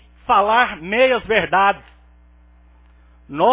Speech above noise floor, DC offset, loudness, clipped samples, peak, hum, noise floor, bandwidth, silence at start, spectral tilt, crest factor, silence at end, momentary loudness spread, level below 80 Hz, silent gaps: 33 dB; under 0.1%; -17 LUFS; under 0.1%; -2 dBFS; 60 Hz at -50 dBFS; -49 dBFS; 3.9 kHz; 0.3 s; -7.5 dB/octave; 18 dB; 0 s; 5 LU; -48 dBFS; none